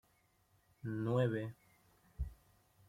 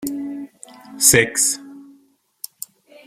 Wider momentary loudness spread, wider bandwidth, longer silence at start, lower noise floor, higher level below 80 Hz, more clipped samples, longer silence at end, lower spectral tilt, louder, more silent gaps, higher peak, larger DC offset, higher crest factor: second, 14 LU vs 24 LU; about the same, 15 kHz vs 16.5 kHz; first, 0.85 s vs 0 s; first, -74 dBFS vs -57 dBFS; about the same, -54 dBFS vs -52 dBFS; neither; second, 0.55 s vs 1.25 s; first, -8.5 dB/octave vs -2 dB/octave; second, -40 LUFS vs -16 LUFS; neither; second, -22 dBFS vs 0 dBFS; neither; about the same, 20 dB vs 22 dB